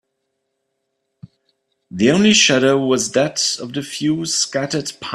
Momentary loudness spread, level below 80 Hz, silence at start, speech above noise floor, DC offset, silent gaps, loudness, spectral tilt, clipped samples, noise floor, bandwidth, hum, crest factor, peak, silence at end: 12 LU; -58 dBFS; 1.9 s; 56 dB; under 0.1%; none; -16 LUFS; -3 dB/octave; under 0.1%; -73 dBFS; 13 kHz; none; 18 dB; 0 dBFS; 0 s